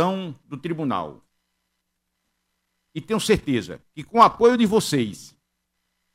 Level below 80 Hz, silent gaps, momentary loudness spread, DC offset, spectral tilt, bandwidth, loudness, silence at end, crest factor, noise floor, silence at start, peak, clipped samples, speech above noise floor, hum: -52 dBFS; none; 21 LU; under 0.1%; -5 dB/octave; 16 kHz; -21 LUFS; 0.85 s; 20 dB; -76 dBFS; 0 s; -4 dBFS; under 0.1%; 55 dB; none